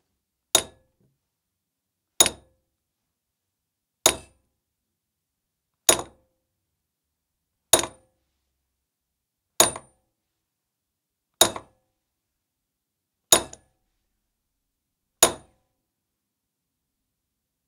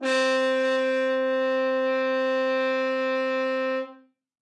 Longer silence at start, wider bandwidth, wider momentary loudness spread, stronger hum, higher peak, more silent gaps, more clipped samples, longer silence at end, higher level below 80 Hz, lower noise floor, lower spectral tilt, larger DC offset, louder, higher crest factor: first, 0.55 s vs 0 s; first, 16 kHz vs 10.5 kHz; first, 18 LU vs 4 LU; neither; first, 0 dBFS vs -14 dBFS; neither; neither; first, 2.3 s vs 0.6 s; first, -58 dBFS vs under -90 dBFS; first, -83 dBFS vs -51 dBFS; second, -0.5 dB/octave vs -2 dB/octave; neither; first, -21 LUFS vs -24 LUFS; first, 30 dB vs 10 dB